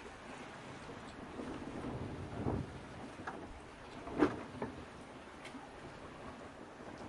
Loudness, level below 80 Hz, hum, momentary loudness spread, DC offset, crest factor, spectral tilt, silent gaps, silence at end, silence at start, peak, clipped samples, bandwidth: -44 LUFS; -60 dBFS; none; 14 LU; under 0.1%; 28 dB; -6.5 dB/octave; none; 0 s; 0 s; -16 dBFS; under 0.1%; 11.5 kHz